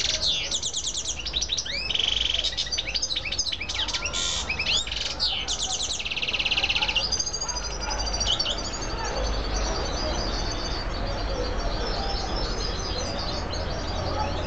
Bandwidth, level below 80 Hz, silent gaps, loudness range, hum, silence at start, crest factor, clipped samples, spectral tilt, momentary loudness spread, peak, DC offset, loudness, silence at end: 9.2 kHz; -34 dBFS; none; 5 LU; none; 0 s; 16 dB; under 0.1%; -2 dB/octave; 7 LU; -10 dBFS; 0.9%; -26 LUFS; 0 s